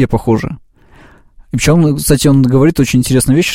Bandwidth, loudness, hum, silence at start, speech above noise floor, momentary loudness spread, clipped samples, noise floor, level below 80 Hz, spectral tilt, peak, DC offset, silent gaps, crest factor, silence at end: 16.5 kHz; -11 LUFS; none; 0 s; 32 dB; 10 LU; under 0.1%; -42 dBFS; -30 dBFS; -5.5 dB/octave; 0 dBFS; under 0.1%; none; 12 dB; 0 s